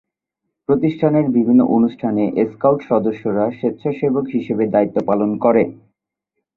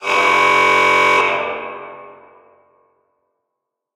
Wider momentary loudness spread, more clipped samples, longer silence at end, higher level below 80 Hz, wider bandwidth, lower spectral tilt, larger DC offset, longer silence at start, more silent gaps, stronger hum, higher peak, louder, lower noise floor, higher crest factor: second, 7 LU vs 19 LU; neither; second, 0.85 s vs 1.85 s; about the same, -58 dBFS vs -62 dBFS; second, 4.2 kHz vs 17 kHz; first, -10.5 dB/octave vs -2 dB/octave; neither; first, 0.7 s vs 0 s; neither; neither; about the same, -2 dBFS vs 0 dBFS; second, -17 LUFS vs -13 LUFS; about the same, -78 dBFS vs -79 dBFS; about the same, 16 dB vs 18 dB